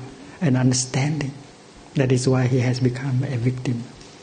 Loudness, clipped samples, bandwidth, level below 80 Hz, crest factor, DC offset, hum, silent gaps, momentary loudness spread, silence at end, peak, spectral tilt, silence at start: -22 LUFS; under 0.1%; 9.6 kHz; -52 dBFS; 18 dB; under 0.1%; none; none; 12 LU; 0 s; -4 dBFS; -6 dB/octave; 0 s